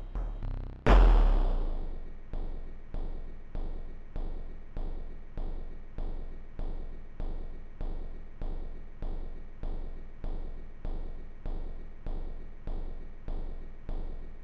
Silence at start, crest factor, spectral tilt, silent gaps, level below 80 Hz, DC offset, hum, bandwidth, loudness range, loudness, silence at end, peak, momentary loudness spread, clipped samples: 0 s; 18 dB; -8 dB/octave; none; -32 dBFS; 0.1%; none; 5.6 kHz; 13 LU; -37 LUFS; 0 s; -12 dBFS; 14 LU; under 0.1%